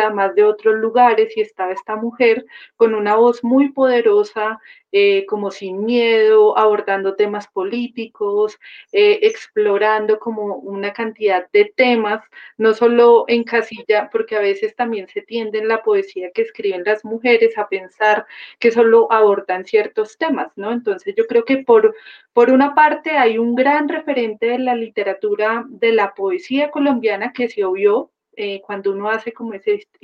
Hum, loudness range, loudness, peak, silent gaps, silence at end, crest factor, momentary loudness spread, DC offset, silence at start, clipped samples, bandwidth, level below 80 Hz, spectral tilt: none; 4 LU; -16 LUFS; -2 dBFS; none; 0.25 s; 14 dB; 11 LU; under 0.1%; 0 s; under 0.1%; 7 kHz; -70 dBFS; -5.5 dB/octave